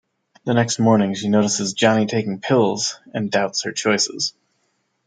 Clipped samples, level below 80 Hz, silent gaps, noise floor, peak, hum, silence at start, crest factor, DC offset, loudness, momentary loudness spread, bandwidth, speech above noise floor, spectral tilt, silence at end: under 0.1%; -66 dBFS; none; -69 dBFS; -2 dBFS; none; 0.45 s; 18 dB; under 0.1%; -19 LUFS; 7 LU; 9.6 kHz; 50 dB; -4 dB/octave; 0.75 s